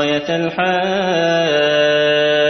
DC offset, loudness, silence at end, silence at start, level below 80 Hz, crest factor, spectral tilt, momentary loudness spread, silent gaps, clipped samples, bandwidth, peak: under 0.1%; -15 LUFS; 0 s; 0 s; -60 dBFS; 12 dB; -4.5 dB/octave; 4 LU; none; under 0.1%; 6.4 kHz; -2 dBFS